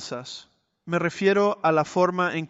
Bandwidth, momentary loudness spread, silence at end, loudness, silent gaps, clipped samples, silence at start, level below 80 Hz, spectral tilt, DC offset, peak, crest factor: 8 kHz; 15 LU; 0.05 s; -23 LUFS; none; under 0.1%; 0 s; -68 dBFS; -5.5 dB/octave; under 0.1%; -8 dBFS; 16 dB